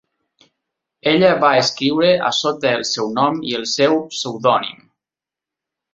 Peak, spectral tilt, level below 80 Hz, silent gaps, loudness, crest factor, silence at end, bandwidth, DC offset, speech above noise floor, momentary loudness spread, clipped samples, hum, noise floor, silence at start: -2 dBFS; -4 dB/octave; -60 dBFS; none; -17 LUFS; 18 dB; 1.2 s; 8 kHz; under 0.1%; 71 dB; 7 LU; under 0.1%; none; -88 dBFS; 1.05 s